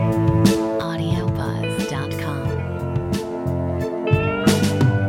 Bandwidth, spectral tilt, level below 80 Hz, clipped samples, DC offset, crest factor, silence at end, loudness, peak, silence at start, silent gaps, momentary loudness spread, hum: 17 kHz; -6.5 dB/octave; -40 dBFS; under 0.1%; under 0.1%; 18 dB; 0 s; -21 LUFS; -2 dBFS; 0 s; none; 8 LU; none